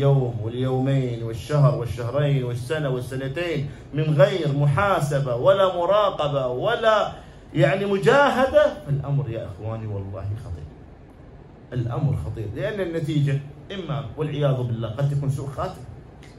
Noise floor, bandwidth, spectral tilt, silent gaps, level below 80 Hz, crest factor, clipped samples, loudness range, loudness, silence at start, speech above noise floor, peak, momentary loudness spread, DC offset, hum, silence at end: -44 dBFS; 12 kHz; -7 dB/octave; none; -46 dBFS; 18 dB; under 0.1%; 9 LU; -23 LUFS; 0 s; 22 dB; -4 dBFS; 13 LU; under 0.1%; none; 0 s